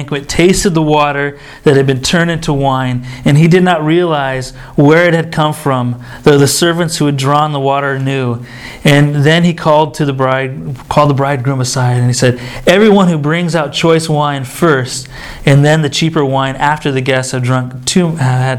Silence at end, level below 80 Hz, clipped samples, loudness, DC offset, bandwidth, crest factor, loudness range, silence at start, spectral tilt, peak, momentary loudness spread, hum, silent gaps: 0 s; -36 dBFS; 0.4%; -11 LUFS; under 0.1%; 15.5 kHz; 10 dB; 1 LU; 0 s; -5.5 dB/octave; 0 dBFS; 8 LU; none; none